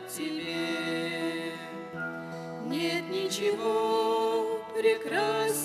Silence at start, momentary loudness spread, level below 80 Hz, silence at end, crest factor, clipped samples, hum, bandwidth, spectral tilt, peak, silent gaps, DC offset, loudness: 0 s; 10 LU; -74 dBFS; 0 s; 16 dB; under 0.1%; none; 15.5 kHz; -3.5 dB/octave; -14 dBFS; none; under 0.1%; -30 LUFS